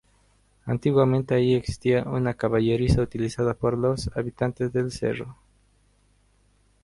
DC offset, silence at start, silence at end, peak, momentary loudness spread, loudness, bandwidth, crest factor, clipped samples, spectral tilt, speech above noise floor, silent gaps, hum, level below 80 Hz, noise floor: under 0.1%; 0.65 s; 1.5 s; -8 dBFS; 8 LU; -24 LUFS; 11.5 kHz; 18 dB; under 0.1%; -7.5 dB/octave; 39 dB; none; 50 Hz at -50 dBFS; -42 dBFS; -63 dBFS